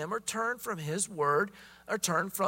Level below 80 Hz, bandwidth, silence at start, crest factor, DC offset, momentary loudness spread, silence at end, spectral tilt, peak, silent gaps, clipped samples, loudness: -70 dBFS; 16.5 kHz; 0 s; 18 dB; under 0.1%; 8 LU; 0 s; -3.5 dB/octave; -14 dBFS; none; under 0.1%; -32 LUFS